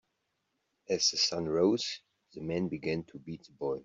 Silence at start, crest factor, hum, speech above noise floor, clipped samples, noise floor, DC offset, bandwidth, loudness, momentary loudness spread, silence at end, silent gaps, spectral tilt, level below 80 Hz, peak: 0.9 s; 18 dB; none; 49 dB; under 0.1%; -81 dBFS; under 0.1%; 7.8 kHz; -31 LUFS; 18 LU; 0 s; none; -3.5 dB/octave; -68 dBFS; -14 dBFS